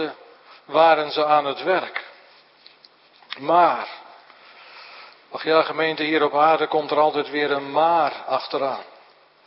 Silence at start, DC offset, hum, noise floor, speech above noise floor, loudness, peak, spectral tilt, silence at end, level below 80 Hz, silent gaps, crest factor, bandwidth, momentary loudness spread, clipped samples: 0 s; under 0.1%; none; -53 dBFS; 33 dB; -20 LUFS; -4 dBFS; -8.5 dB/octave; 0.6 s; -80 dBFS; none; 18 dB; 5.8 kHz; 18 LU; under 0.1%